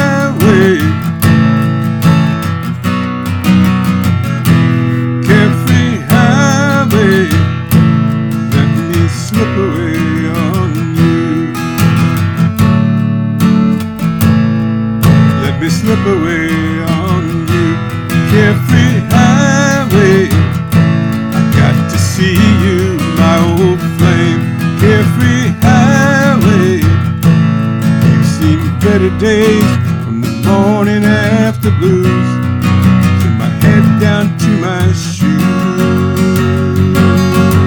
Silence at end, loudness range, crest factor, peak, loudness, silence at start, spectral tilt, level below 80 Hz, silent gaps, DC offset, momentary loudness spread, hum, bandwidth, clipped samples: 0 s; 3 LU; 10 dB; 0 dBFS; -10 LUFS; 0 s; -6.5 dB/octave; -34 dBFS; none; under 0.1%; 5 LU; none; 19.5 kHz; 0.5%